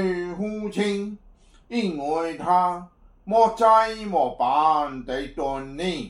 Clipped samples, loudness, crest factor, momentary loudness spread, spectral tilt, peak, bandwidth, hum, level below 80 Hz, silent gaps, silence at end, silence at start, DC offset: under 0.1%; -23 LUFS; 18 dB; 12 LU; -5.5 dB/octave; -6 dBFS; 11.5 kHz; none; -50 dBFS; none; 0 s; 0 s; under 0.1%